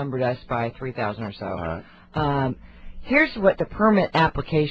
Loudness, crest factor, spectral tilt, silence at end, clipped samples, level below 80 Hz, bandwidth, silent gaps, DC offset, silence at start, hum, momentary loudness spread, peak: -23 LUFS; 20 dB; -8.5 dB/octave; 0 s; under 0.1%; -44 dBFS; 8 kHz; none; under 0.1%; 0 s; none; 12 LU; -4 dBFS